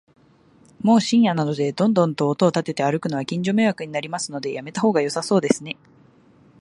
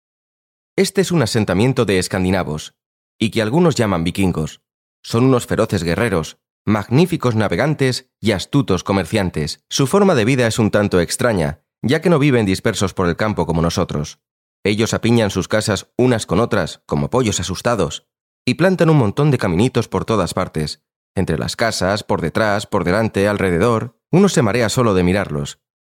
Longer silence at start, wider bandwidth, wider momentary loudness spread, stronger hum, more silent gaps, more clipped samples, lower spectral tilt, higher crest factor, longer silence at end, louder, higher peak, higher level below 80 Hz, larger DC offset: about the same, 0.85 s vs 0.75 s; second, 11.5 kHz vs 16.5 kHz; about the same, 9 LU vs 9 LU; neither; second, none vs 2.86-3.19 s, 4.74-5.03 s, 6.50-6.65 s, 14.31-14.63 s, 18.21-18.45 s, 20.96-21.14 s; neither; about the same, -5.5 dB/octave vs -5.5 dB/octave; first, 20 dB vs 14 dB; first, 0.85 s vs 0.35 s; second, -21 LUFS vs -17 LUFS; about the same, 0 dBFS vs -2 dBFS; second, -66 dBFS vs -46 dBFS; neither